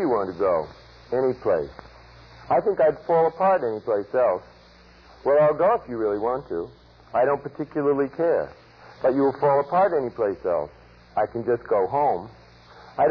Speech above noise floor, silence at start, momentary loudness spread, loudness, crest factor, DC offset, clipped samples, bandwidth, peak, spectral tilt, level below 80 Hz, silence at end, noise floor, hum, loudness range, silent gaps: 28 dB; 0 s; 11 LU; -23 LUFS; 12 dB; under 0.1%; under 0.1%; 5.4 kHz; -12 dBFS; -9 dB/octave; -56 dBFS; 0 s; -51 dBFS; none; 2 LU; none